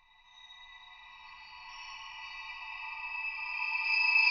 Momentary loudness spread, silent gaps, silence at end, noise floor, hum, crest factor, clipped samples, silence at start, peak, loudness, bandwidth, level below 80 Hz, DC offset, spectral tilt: 24 LU; none; 0 s; -58 dBFS; none; 20 dB; under 0.1%; 0.35 s; -16 dBFS; -32 LUFS; 6.8 kHz; -68 dBFS; under 0.1%; 6.5 dB/octave